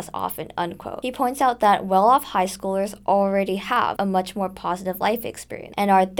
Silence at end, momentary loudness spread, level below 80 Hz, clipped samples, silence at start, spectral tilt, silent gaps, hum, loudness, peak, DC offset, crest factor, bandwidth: 0 s; 11 LU; -54 dBFS; under 0.1%; 0 s; -5 dB/octave; none; none; -22 LUFS; -4 dBFS; under 0.1%; 16 dB; over 20 kHz